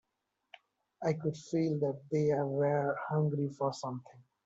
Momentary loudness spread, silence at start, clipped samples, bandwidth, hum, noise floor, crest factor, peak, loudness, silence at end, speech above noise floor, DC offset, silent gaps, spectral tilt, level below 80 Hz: 6 LU; 1 s; under 0.1%; 7.8 kHz; none; -84 dBFS; 16 dB; -18 dBFS; -33 LUFS; 0.25 s; 51 dB; under 0.1%; none; -7.5 dB/octave; -76 dBFS